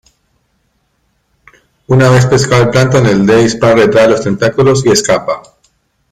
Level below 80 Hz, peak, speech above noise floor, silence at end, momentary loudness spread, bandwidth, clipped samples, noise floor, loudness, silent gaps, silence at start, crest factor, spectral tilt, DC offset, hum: -40 dBFS; 0 dBFS; 52 dB; 0.7 s; 6 LU; 14.5 kHz; under 0.1%; -60 dBFS; -9 LUFS; none; 1.9 s; 10 dB; -5.5 dB/octave; under 0.1%; none